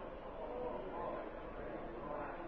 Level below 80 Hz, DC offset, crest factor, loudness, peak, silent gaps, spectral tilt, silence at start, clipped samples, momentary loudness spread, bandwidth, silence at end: -56 dBFS; under 0.1%; 14 dB; -46 LUFS; -32 dBFS; none; -5 dB/octave; 0 s; under 0.1%; 4 LU; 6 kHz; 0 s